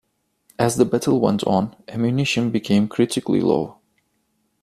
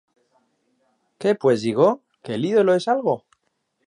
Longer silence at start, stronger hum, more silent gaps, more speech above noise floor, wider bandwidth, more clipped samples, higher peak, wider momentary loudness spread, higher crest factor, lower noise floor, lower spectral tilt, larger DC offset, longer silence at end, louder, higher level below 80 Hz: second, 0.6 s vs 1.2 s; neither; neither; second, 49 dB vs 53 dB; first, 14.5 kHz vs 10.5 kHz; neither; about the same, -4 dBFS vs -4 dBFS; second, 5 LU vs 10 LU; about the same, 18 dB vs 18 dB; about the same, -69 dBFS vs -72 dBFS; about the same, -6 dB/octave vs -6.5 dB/octave; neither; first, 0.9 s vs 0.7 s; about the same, -20 LUFS vs -21 LUFS; first, -56 dBFS vs -72 dBFS